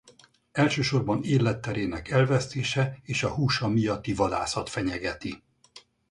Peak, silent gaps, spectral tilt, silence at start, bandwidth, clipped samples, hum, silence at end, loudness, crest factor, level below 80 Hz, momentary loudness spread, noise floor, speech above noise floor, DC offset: -8 dBFS; none; -5.5 dB/octave; 0.05 s; 11 kHz; under 0.1%; none; 0.3 s; -27 LUFS; 18 dB; -50 dBFS; 8 LU; -58 dBFS; 32 dB; under 0.1%